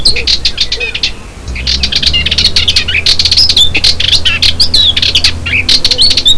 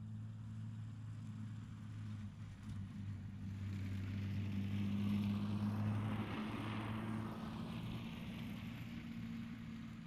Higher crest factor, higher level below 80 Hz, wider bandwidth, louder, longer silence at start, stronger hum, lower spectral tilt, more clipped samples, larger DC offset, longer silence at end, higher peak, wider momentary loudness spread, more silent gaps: second, 8 dB vs 16 dB; first, -22 dBFS vs -62 dBFS; second, 11 kHz vs 13 kHz; first, -7 LUFS vs -45 LUFS; about the same, 0 s vs 0 s; neither; second, -1.5 dB/octave vs -7.5 dB/octave; first, 2% vs under 0.1%; neither; about the same, 0 s vs 0 s; first, 0 dBFS vs -28 dBFS; about the same, 8 LU vs 10 LU; neither